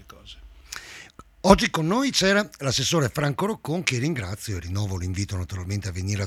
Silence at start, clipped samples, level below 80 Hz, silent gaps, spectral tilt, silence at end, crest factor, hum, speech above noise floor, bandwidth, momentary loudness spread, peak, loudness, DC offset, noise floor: 0 s; under 0.1%; -44 dBFS; none; -4.5 dB/octave; 0 s; 24 dB; none; 23 dB; 16.5 kHz; 19 LU; 0 dBFS; -24 LUFS; under 0.1%; -47 dBFS